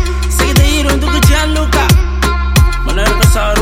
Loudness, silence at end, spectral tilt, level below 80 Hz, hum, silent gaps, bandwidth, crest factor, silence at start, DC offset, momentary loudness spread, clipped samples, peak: -11 LUFS; 0 s; -4.5 dB/octave; -12 dBFS; none; none; 16.5 kHz; 10 dB; 0 s; under 0.1%; 4 LU; under 0.1%; 0 dBFS